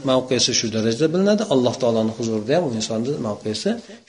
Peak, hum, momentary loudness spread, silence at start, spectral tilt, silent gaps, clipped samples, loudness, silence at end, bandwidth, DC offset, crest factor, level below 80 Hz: -4 dBFS; none; 7 LU; 0 s; -4.5 dB/octave; none; under 0.1%; -20 LUFS; 0.1 s; 10 kHz; under 0.1%; 16 dB; -58 dBFS